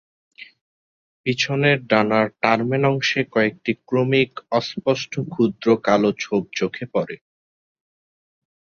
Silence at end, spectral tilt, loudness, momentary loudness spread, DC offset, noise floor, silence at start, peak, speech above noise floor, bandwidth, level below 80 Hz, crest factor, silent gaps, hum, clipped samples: 1.45 s; -5.5 dB/octave; -20 LUFS; 8 LU; under 0.1%; under -90 dBFS; 0.4 s; 0 dBFS; over 70 dB; 7.4 kHz; -60 dBFS; 22 dB; 0.61-1.24 s; none; under 0.1%